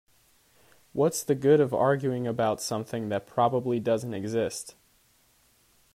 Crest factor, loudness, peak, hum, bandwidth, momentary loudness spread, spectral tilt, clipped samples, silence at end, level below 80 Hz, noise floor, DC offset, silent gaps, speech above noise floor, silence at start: 18 dB; -27 LUFS; -10 dBFS; none; 15.5 kHz; 10 LU; -5.5 dB/octave; under 0.1%; 1.25 s; -66 dBFS; -64 dBFS; under 0.1%; none; 38 dB; 0.95 s